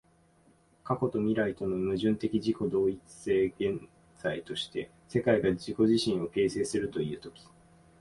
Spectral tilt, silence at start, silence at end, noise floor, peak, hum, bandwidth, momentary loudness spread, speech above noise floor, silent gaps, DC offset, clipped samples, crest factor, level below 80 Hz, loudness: -6 dB/octave; 0.85 s; 0.7 s; -64 dBFS; -12 dBFS; none; 11.5 kHz; 10 LU; 34 dB; none; under 0.1%; under 0.1%; 18 dB; -58 dBFS; -30 LUFS